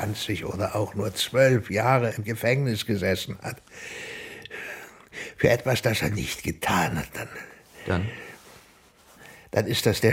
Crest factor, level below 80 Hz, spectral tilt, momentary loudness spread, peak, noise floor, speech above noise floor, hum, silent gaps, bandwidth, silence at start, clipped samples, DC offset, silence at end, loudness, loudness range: 22 dB; -52 dBFS; -5 dB/octave; 17 LU; -4 dBFS; -55 dBFS; 30 dB; none; none; 16.5 kHz; 0 s; under 0.1%; under 0.1%; 0 s; -26 LUFS; 6 LU